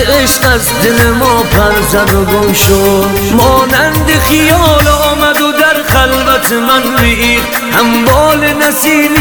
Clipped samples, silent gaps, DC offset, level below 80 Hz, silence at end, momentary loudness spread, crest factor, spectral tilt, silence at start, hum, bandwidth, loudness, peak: 2%; none; under 0.1%; -20 dBFS; 0 s; 2 LU; 8 dB; -4 dB/octave; 0 s; none; over 20 kHz; -8 LUFS; 0 dBFS